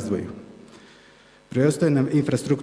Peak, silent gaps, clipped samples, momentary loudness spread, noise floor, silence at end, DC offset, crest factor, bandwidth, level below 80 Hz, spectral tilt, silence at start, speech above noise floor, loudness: -6 dBFS; none; under 0.1%; 14 LU; -52 dBFS; 0 s; under 0.1%; 18 dB; 11 kHz; -60 dBFS; -7 dB/octave; 0 s; 31 dB; -22 LUFS